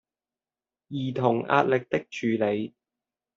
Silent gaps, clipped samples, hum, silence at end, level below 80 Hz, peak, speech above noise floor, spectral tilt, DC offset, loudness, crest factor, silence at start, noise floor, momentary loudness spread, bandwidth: none; under 0.1%; none; 0.7 s; -70 dBFS; -6 dBFS; over 65 dB; -5.5 dB/octave; under 0.1%; -26 LUFS; 22 dB; 0.9 s; under -90 dBFS; 10 LU; 7.6 kHz